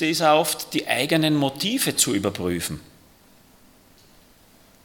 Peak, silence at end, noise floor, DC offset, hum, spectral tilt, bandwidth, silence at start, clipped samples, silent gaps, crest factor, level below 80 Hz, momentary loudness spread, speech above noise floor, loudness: -2 dBFS; 2 s; -54 dBFS; under 0.1%; none; -3.5 dB/octave; 18 kHz; 0 s; under 0.1%; none; 22 dB; -58 dBFS; 9 LU; 32 dB; -21 LUFS